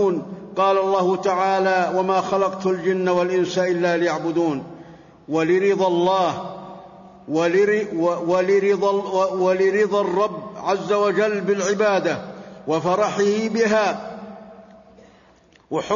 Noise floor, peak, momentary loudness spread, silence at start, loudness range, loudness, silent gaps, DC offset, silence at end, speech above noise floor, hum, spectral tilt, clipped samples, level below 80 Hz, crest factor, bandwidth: -54 dBFS; -8 dBFS; 11 LU; 0 s; 3 LU; -20 LUFS; none; under 0.1%; 0 s; 34 dB; none; -5.5 dB/octave; under 0.1%; -64 dBFS; 12 dB; 7.4 kHz